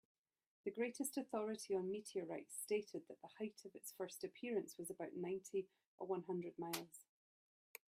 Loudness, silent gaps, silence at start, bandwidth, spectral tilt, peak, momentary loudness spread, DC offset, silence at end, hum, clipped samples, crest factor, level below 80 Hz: -47 LUFS; 5.87-5.98 s; 0.65 s; 16 kHz; -4.5 dB/octave; -28 dBFS; 11 LU; under 0.1%; 0.85 s; none; under 0.1%; 18 dB; under -90 dBFS